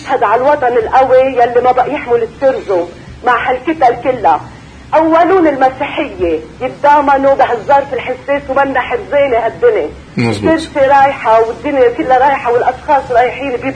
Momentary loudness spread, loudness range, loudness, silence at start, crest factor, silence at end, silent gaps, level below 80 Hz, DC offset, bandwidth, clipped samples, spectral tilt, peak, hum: 8 LU; 2 LU; -11 LUFS; 0 s; 12 dB; 0 s; none; -40 dBFS; under 0.1%; 10 kHz; under 0.1%; -6 dB/octave; 0 dBFS; none